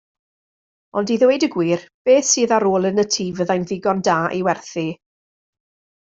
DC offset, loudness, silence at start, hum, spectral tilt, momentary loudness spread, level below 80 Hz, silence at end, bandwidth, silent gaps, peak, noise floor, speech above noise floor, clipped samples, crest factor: under 0.1%; -19 LUFS; 0.95 s; none; -4 dB/octave; 10 LU; -62 dBFS; 1.05 s; 8.2 kHz; 1.94-2.05 s; -2 dBFS; under -90 dBFS; over 72 dB; under 0.1%; 16 dB